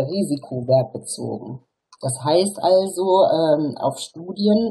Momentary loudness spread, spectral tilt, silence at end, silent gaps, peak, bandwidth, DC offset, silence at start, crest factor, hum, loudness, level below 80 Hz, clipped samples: 14 LU; -5.5 dB/octave; 0 s; none; -6 dBFS; 12.5 kHz; under 0.1%; 0 s; 14 dB; none; -20 LUFS; -64 dBFS; under 0.1%